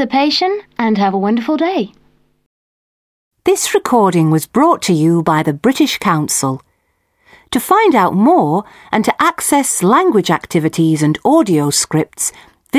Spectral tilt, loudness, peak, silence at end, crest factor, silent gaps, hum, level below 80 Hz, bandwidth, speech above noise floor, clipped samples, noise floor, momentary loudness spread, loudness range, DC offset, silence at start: -4.5 dB/octave; -13 LUFS; 0 dBFS; 0 s; 14 dB; 2.46-3.31 s; none; -54 dBFS; 16 kHz; 50 dB; under 0.1%; -63 dBFS; 8 LU; 4 LU; under 0.1%; 0 s